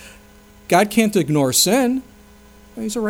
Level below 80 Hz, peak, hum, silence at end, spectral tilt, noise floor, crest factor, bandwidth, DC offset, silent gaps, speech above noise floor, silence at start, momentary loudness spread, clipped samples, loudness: -52 dBFS; -2 dBFS; none; 0 s; -4 dB/octave; -46 dBFS; 18 dB; over 20 kHz; under 0.1%; none; 29 dB; 0 s; 12 LU; under 0.1%; -17 LUFS